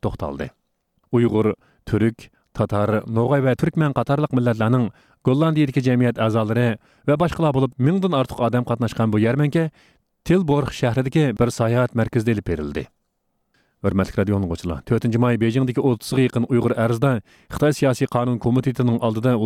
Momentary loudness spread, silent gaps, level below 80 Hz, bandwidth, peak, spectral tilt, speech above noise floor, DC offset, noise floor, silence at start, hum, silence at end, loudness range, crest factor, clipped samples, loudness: 8 LU; none; -46 dBFS; 14.5 kHz; -4 dBFS; -7.5 dB/octave; 52 dB; under 0.1%; -71 dBFS; 0.05 s; none; 0 s; 3 LU; 16 dB; under 0.1%; -20 LUFS